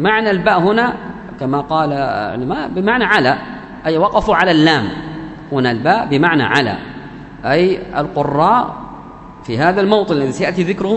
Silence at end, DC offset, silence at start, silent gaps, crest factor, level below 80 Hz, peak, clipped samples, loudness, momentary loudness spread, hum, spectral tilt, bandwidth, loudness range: 0 s; under 0.1%; 0 s; none; 16 dB; -42 dBFS; 0 dBFS; under 0.1%; -15 LUFS; 17 LU; none; -6.5 dB/octave; 9.6 kHz; 2 LU